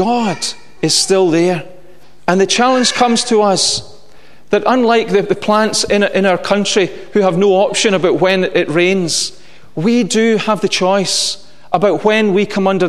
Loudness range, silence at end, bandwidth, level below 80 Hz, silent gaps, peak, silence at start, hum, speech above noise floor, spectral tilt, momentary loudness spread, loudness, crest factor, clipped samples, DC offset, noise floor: 1 LU; 0 s; 13.5 kHz; -52 dBFS; none; 0 dBFS; 0 s; none; 32 dB; -3.5 dB/octave; 7 LU; -13 LUFS; 14 dB; under 0.1%; 2%; -45 dBFS